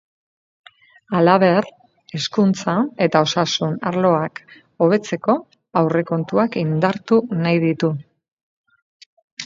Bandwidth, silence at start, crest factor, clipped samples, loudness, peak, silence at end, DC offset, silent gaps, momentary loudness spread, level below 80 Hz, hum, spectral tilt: 7.6 kHz; 1.1 s; 20 dB; under 0.1%; -19 LUFS; 0 dBFS; 0 s; under 0.1%; 8.28-8.37 s, 8.43-8.64 s, 8.82-9.00 s, 9.06-9.17 s, 9.23-9.37 s; 8 LU; -64 dBFS; none; -6 dB/octave